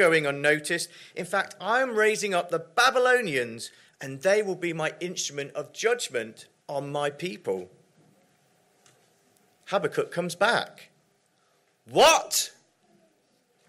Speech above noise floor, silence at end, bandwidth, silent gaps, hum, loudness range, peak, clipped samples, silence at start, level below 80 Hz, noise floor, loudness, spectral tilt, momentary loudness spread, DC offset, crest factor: 42 dB; 1.2 s; 16 kHz; none; none; 9 LU; -8 dBFS; under 0.1%; 0 s; -72 dBFS; -68 dBFS; -26 LUFS; -2.5 dB/octave; 14 LU; under 0.1%; 20 dB